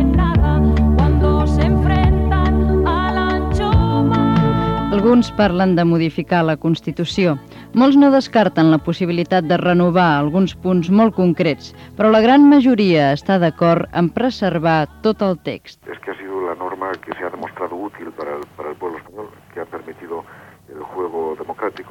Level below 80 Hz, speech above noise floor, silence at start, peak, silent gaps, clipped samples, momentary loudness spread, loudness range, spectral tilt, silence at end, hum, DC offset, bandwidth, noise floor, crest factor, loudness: -26 dBFS; 27 dB; 0 s; -2 dBFS; none; under 0.1%; 17 LU; 14 LU; -8 dB/octave; 0.1 s; none; under 0.1%; 8.2 kHz; -42 dBFS; 14 dB; -16 LUFS